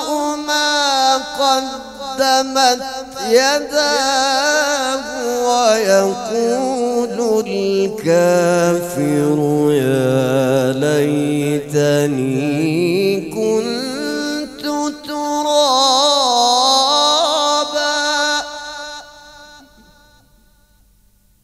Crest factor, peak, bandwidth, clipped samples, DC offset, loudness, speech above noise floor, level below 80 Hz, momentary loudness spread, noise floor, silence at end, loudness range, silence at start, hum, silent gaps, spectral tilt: 16 dB; 0 dBFS; 16 kHz; under 0.1%; under 0.1%; -15 LUFS; 39 dB; -54 dBFS; 9 LU; -54 dBFS; 1.85 s; 5 LU; 0 s; none; none; -3.5 dB/octave